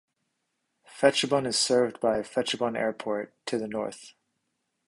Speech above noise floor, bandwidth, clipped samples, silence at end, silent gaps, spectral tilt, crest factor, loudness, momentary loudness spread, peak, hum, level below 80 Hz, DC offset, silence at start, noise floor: 52 dB; 11.5 kHz; under 0.1%; 0.75 s; none; -3 dB/octave; 24 dB; -27 LUFS; 10 LU; -6 dBFS; none; -68 dBFS; under 0.1%; 0.9 s; -79 dBFS